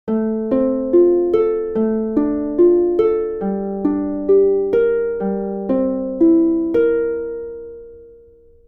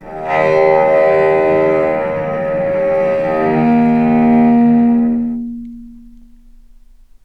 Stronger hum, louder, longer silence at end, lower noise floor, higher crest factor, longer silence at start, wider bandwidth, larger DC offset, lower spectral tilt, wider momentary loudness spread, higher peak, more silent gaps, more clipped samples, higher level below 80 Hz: neither; second, -17 LUFS vs -13 LUFS; second, 0.6 s vs 1.25 s; first, -47 dBFS vs -42 dBFS; about the same, 14 dB vs 14 dB; about the same, 0.05 s vs 0 s; second, 3.5 kHz vs 5 kHz; neither; first, -11 dB/octave vs -9 dB/octave; about the same, 9 LU vs 8 LU; second, -4 dBFS vs 0 dBFS; neither; neither; about the same, -46 dBFS vs -42 dBFS